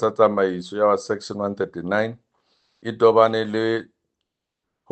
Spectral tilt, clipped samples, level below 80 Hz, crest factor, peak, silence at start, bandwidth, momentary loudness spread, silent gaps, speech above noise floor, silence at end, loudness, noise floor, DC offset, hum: -6 dB/octave; under 0.1%; -70 dBFS; 20 dB; -2 dBFS; 0 s; 8.8 kHz; 11 LU; none; 61 dB; 1.1 s; -21 LUFS; -82 dBFS; under 0.1%; none